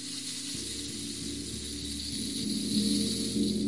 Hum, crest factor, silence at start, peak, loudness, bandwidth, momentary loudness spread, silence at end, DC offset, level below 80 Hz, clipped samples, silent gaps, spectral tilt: none; 18 dB; 0 s; -16 dBFS; -32 LUFS; 11.5 kHz; 8 LU; 0 s; 0.2%; -52 dBFS; under 0.1%; none; -3.5 dB/octave